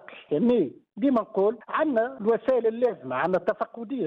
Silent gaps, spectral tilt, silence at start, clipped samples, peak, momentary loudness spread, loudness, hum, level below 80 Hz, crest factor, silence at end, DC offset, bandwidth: none; -9 dB/octave; 0.1 s; under 0.1%; -14 dBFS; 7 LU; -26 LUFS; none; -68 dBFS; 12 dB; 0 s; under 0.1%; 5.6 kHz